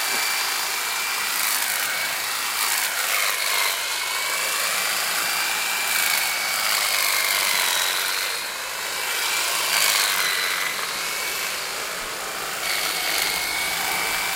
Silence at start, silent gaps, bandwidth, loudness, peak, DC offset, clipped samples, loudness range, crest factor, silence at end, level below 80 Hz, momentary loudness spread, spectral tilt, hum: 0 s; none; 17 kHz; -21 LUFS; -6 dBFS; under 0.1%; under 0.1%; 3 LU; 18 dB; 0 s; -60 dBFS; 6 LU; 2 dB/octave; none